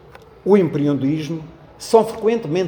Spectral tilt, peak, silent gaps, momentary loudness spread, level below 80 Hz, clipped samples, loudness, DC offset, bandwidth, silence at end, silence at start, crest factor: -7 dB/octave; 0 dBFS; none; 13 LU; -54 dBFS; under 0.1%; -18 LUFS; under 0.1%; over 20 kHz; 0 s; 0.45 s; 18 dB